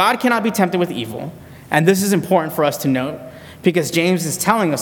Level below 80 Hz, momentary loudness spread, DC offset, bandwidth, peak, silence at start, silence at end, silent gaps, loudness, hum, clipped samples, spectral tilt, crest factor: -56 dBFS; 12 LU; under 0.1%; 19 kHz; 0 dBFS; 0 s; 0 s; none; -18 LUFS; none; under 0.1%; -5 dB/octave; 18 dB